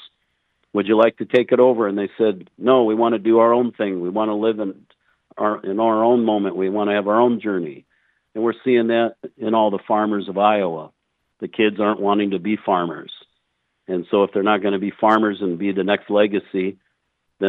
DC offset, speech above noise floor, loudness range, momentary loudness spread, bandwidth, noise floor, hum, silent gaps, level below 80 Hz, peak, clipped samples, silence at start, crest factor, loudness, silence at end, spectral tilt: under 0.1%; 53 dB; 4 LU; 10 LU; 4.5 kHz; -72 dBFS; none; none; -76 dBFS; -2 dBFS; under 0.1%; 0 s; 18 dB; -19 LUFS; 0 s; -8.5 dB/octave